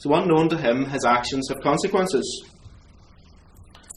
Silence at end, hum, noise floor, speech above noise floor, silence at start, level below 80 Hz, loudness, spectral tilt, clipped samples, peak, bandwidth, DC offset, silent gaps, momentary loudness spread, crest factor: 0.35 s; none; -50 dBFS; 29 dB; 0 s; -52 dBFS; -22 LUFS; -5 dB/octave; under 0.1%; -4 dBFS; 13.5 kHz; under 0.1%; none; 7 LU; 18 dB